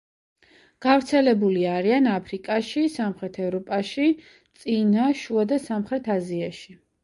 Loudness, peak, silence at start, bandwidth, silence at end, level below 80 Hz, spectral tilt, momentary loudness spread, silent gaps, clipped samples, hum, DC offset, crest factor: -23 LUFS; -6 dBFS; 0.8 s; 11.5 kHz; 0.3 s; -64 dBFS; -6.5 dB/octave; 10 LU; none; under 0.1%; none; under 0.1%; 18 dB